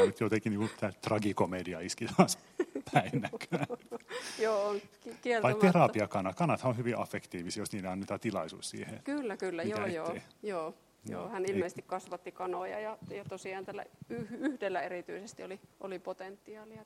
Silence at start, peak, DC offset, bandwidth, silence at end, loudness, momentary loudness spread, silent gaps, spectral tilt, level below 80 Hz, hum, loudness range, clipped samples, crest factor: 0 s; -8 dBFS; under 0.1%; 15 kHz; 0 s; -35 LUFS; 16 LU; none; -5.5 dB/octave; -74 dBFS; none; 9 LU; under 0.1%; 26 dB